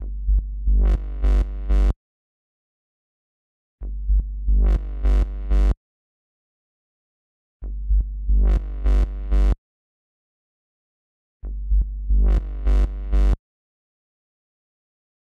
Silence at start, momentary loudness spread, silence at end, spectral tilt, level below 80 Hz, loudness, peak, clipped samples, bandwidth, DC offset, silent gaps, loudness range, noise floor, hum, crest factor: 0 s; 12 LU; 1.85 s; -8.5 dB/octave; -22 dBFS; -24 LUFS; -10 dBFS; under 0.1%; 3.6 kHz; under 0.1%; 1.96-3.78 s, 5.77-7.60 s, 9.58-11.40 s; 3 LU; under -90 dBFS; none; 12 dB